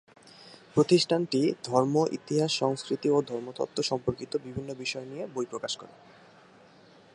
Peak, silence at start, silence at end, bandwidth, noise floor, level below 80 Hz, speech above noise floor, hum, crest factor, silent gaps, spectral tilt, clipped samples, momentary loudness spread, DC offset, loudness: -10 dBFS; 0.25 s; 1.3 s; 11.5 kHz; -56 dBFS; -64 dBFS; 28 dB; none; 20 dB; none; -5 dB/octave; under 0.1%; 12 LU; under 0.1%; -29 LUFS